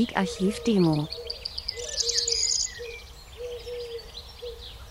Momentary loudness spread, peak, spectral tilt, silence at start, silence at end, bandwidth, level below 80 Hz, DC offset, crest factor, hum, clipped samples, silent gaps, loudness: 17 LU; -8 dBFS; -3.5 dB/octave; 0 s; 0 s; 16 kHz; -48 dBFS; under 0.1%; 20 dB; none; under 0.1%; none; -26 LUFS